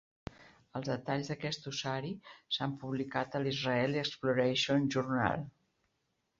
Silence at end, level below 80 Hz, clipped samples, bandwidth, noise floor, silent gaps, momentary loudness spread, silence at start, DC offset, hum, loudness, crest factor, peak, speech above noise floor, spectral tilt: 0.9 s; -66 dBFS; under 0.1%; 7.6 kHz; -81 dBFS; none; 14 LU; 0.4 s; under 0.1%; none; -34 LUFS; 22 dB; -12 dBFS; 47 dB; -4 dB/octave